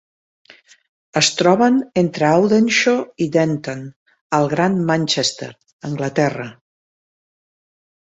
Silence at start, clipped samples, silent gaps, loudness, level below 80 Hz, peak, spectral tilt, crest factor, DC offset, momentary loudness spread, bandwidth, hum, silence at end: 1.15 s; under 0.1%; 3.96-4.06 s, 4.21-4.30 s, 5.73-5.79 s; -17 LUFS; -60 dBFS; -2 dBFS; -4.5 dB/octave; 18 dB; under 0.1%; 17 LU; 8.4 kHz; none; 1.55 s